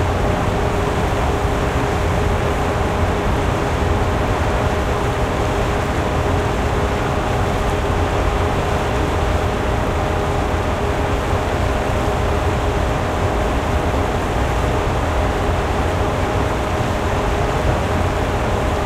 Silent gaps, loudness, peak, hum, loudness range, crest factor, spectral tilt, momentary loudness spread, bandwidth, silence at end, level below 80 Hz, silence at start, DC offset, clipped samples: none; -19 LUFS; -4 dBFS; none; 1 LU; 14 dB; -6 dB/octave; 1 LU; 15.5 kHz; 0 s; -24 dBFS; 0 s; under 0.1%; under 0.1%